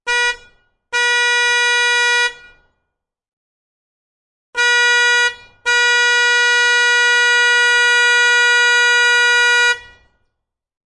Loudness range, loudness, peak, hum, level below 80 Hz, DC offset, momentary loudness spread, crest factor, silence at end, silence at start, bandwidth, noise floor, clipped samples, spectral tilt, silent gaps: 7 LU; -12 LUFS; -4 dBFS; none; -56 dBFS; under 0.1%; 7 LU; 12 dB; 1.05 s; 0.05 s; 11.5 kHz; -76 dBFS; under 0.1%; 3.5 dB/octave; 3.33-4.53 s